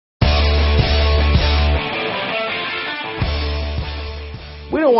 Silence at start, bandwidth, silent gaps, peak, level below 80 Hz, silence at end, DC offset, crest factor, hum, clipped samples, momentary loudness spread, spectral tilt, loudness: 0.2 s; 6 kHz; none; -2 dBFS; -20 dBFS; 0 s; under 0.1%; 14 dB; none; under 0.1%; 12 LU; -4 dB/octave; -18 LUFS